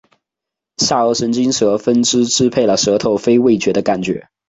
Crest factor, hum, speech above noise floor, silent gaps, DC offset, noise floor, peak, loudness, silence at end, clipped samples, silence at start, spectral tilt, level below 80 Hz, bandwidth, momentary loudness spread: 14 dB; none; 70 dB; none; under 0.1%; -84 dBFS; -2 dBFS; -14 LUFS; 0.3 s; under 0.1%; 0.8 s; -4 dB/octave; -52 dBFS; 8 kHz; 5 LU